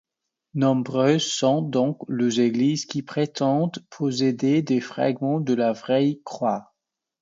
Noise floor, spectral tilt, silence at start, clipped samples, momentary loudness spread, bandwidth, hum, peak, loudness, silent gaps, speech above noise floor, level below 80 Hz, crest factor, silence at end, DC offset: -82 dBFS; -5.5 dB/octave; 0.55 s; under 0.1%; 6 LU; 7.8 kHz; none; -6 dBFS; -23 LUFS; none; 60 dB; -70 dBFS; 16 dB; 0.6 s; under 0.1%